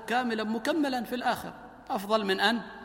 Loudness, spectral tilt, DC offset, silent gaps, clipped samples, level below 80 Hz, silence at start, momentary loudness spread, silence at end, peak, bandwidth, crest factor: -29 LUFS; -4 dB/octave; under 0.1%; none; under 0.1%; -64 dBFS; 0 s; 10 LU; 0 s; -12 dBFS; 17 kHz; 18 dB